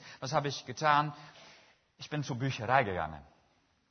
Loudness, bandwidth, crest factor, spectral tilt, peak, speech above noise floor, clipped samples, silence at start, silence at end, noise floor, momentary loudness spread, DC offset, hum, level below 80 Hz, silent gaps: -32 LUFS; 6.4 kHz; 24 dB; -3.5 dB/octave; -10 dBFS; 39 dB; under 0.1%; 0 s; 0.7 s; -71 dBFS; 22 LU; under 0.1%; none; -64 dBFS; none